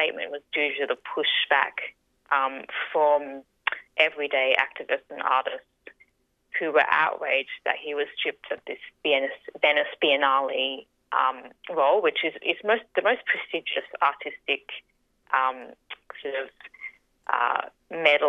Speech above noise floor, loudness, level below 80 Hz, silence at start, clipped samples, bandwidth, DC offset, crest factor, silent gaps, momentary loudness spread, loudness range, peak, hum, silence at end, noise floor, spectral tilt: 41 dB; -25 LUFS; -76 dBFS; 0 s; under 0.1%; 7.4 kHz; under 0.1%; 22 dB; none; 16 LU; 5 LU; -4 dBFS; none; 0 s; -67 dBFS; -4 dB/octave